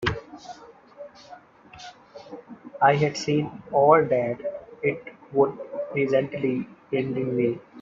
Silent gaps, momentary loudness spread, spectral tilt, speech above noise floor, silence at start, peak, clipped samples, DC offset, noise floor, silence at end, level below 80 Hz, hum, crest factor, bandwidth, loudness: none; 24 LU; -6.5 dB/octave; 26 dB; 0 s; -4 dBFS; under 0.1%; under 0.1%; -48 dBFS; 0 s; -56 dBFS; none; 22 dB; 7.6 kHz; -24 LUFS